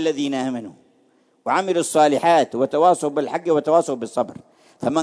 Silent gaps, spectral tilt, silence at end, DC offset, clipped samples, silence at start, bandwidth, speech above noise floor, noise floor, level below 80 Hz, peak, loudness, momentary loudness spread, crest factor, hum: none; -4.5 dB/octave; 0 s; under 0.1%; under 0.1%; 0 s; 11 kHz; 40 dB; -60 dBFS; -70 dBFS; -4 dBFS; -20 LUFS; 11 LU; 18 dB; none